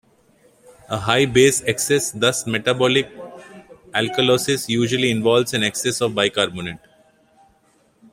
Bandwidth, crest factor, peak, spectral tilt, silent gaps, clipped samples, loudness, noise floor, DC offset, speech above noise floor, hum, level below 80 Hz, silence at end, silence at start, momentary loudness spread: 16 kHz; 20 dB; 0 dBFS; -3.5 dB/octave; none; under 0.1%; -19 LUFS; -59 dBFS; under 0.1%; 40 dB; none; -54 dBFS; 1.35 s; 0.9 s; 13 LU